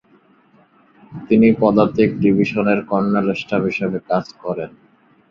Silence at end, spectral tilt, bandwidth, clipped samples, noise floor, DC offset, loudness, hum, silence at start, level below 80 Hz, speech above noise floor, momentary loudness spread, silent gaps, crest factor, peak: 0.6 s; -8.5 dB/octave; 7 kHz; under 0.1%; -54 dBFS; under 0.1%; -17 LUFS; none; 1.1 s; -52 dBFS; 37 dB; 13 LU; none; 16 dB; -2 dBFS